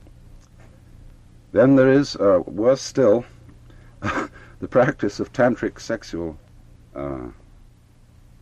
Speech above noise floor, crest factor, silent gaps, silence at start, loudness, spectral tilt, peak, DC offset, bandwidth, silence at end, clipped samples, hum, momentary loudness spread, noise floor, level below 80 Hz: 32 dB; 18 dB; none; 0.35 s; -20 LUFS; -6.5 dB/octave; -4 dBFS; under 0.1%; 8.8 kHz; 1.1 s; under 0.1%; none; 18 LU; -51 dBFS; -48 dBFS